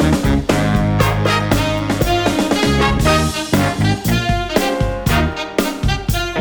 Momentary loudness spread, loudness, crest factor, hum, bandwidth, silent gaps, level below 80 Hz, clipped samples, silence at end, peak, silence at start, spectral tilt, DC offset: 4 LU; -16 LUFS; 16 dB; none; over 20 kHz; none; -24 dBFS; under 0.1%; 0 s; 0 dBFS; 0 s; -5.5 dB/octave; under 0.1%